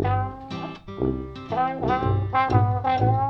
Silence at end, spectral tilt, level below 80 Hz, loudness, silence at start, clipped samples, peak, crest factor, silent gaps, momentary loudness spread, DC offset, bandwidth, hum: 0 s; -9 dB/octave; -40 dBFS; -24 LUFS; 0 s; under 0.1%; -6 dBFS; 18 dB; none; 13 LU; under 0.1%; 6 kHz; none